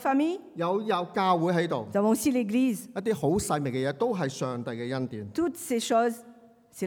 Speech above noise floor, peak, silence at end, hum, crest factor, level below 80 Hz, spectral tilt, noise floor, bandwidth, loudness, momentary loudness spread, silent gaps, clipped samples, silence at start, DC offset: 26 dB; -12 dBFS; 0 s; none; 16 dB; -60 dBFS; -5.5 dB/octave; -53 dBFS; 19.5 kHz; -28 LUFS; 8 LU; none; under 0.1%; 0 s; under 0.1%